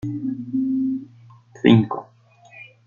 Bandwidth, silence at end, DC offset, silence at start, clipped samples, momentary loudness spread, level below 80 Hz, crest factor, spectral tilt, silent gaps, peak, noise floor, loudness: 7 kHz; 0.25 s; under 0.1%; 0.05 s; under 0.1%; 18 LU; -58 dBFS; 20 dB; -8.5 dB/octave; none; -2 dBFS; -52 dBFS; -21 LUFS